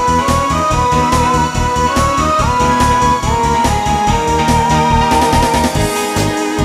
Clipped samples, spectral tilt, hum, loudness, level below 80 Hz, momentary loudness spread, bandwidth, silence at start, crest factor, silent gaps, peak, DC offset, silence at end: under 0.1%; -4.5 dB/octave; none; -13 LUFS; -24 dBFS; 3 LU; 16 kHz; 0 s; 12 dB; none; 0 dBFS; under 0.1%; 0 s